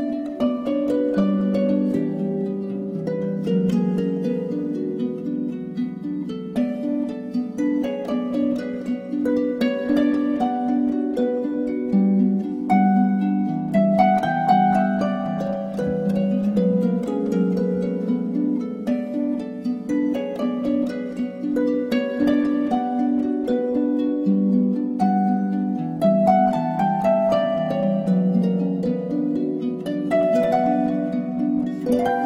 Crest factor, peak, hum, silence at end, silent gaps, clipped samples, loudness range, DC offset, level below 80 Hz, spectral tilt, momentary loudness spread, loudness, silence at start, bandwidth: 16 dB; -4 dBFS; none; 0 s; none; under 0.1%; 5 LU; under 0.1%; -56 dBFS; -9 dB/octave; 8 LU; -22 LUFS; 0 s; 8 kHz